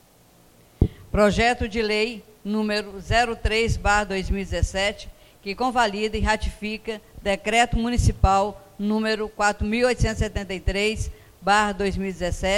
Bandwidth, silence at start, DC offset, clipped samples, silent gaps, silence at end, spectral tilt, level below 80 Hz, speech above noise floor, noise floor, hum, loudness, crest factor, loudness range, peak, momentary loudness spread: 16.5 kHz; 0.8 s; under 0.1%; under 0.1%; none; 0 s; -5 dB/octave; -32 dBFS; 32 dB; -55 dBFS; none; -23 LUFS; 20 dB; 2 LU; -4 dBFS; 10 LU